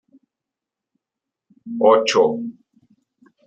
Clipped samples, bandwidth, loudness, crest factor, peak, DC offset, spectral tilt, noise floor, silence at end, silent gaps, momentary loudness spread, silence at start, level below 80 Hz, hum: under 0.1%; 8.8 kHz; -17 LUFS; 20 dB; -2 dBFS; under 0.1%; -3.5 dB/octave; -86 dBFS; 0.95 s; none; 18 LU; 1.65 s; -72 dBFS; none